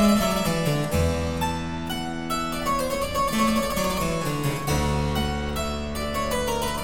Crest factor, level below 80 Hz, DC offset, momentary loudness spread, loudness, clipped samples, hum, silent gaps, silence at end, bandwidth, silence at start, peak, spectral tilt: 16 dB; -36 dBFS; 1%; 6 LU; -25 LUFS; under 0.1%; none; none; 0 s; 17 kHz; 0 s; -8 dBFS; -5 dB/octave